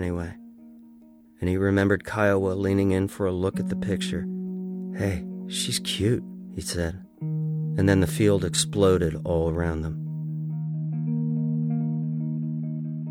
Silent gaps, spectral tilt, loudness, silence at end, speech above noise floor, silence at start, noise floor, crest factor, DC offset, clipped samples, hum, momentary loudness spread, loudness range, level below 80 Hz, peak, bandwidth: none; -5.5 dB/octave; -26 LUFS; 0 s; 27 dB; 0 s; -51 dBFS; 18 dB; under 0.1%; under 0.1%; none; 11 LU; 5 LU; -46 dBFS; -6 dBFS; 16 kHz